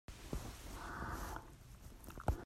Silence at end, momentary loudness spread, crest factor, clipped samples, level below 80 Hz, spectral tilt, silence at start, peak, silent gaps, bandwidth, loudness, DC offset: 0 s; 14 LU; 24 dB; under 0.1%; -50 dBFS; -5.5 dB/octave; 0.1 s; -22 dBFS; none; 16 kHz; -48 LUFS; under 0.1%